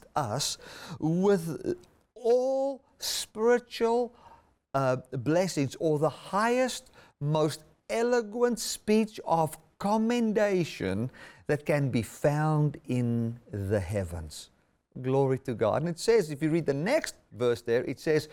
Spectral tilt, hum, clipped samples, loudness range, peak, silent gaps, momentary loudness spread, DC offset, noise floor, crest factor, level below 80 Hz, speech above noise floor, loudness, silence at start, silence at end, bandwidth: -5.5 dB/octave; none; under 0.1%; 2 LU; -14 dBFS; none; 10 LU; under 0.1%; -57 dBFS; 16 dB; -60 dBFS; 29 dB; -29 LUFS; 0.15 s; 0.05 s; 17.5 kHz